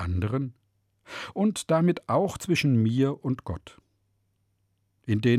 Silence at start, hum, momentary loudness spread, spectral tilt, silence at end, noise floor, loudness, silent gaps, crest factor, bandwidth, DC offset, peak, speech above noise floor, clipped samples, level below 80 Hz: 0 s; none; 15 LU; -6.5 dB/octave; 0 s; -72 dBFS; -26 LUFS; none; 16 dB; 14.5 kHz; under 0.1%; -12 dBFS; 47 dB; under 0.1%; -56 dBFS